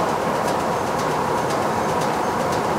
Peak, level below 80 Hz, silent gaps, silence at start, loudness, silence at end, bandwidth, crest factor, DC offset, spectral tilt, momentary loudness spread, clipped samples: -8 dBFS; -48 dBFS; none; 0 s; -21 LUFS; 0 s; 16 kHz; 12 dB; under 0.1%; -4.5 dB/octave; 1 LU; under 0.1%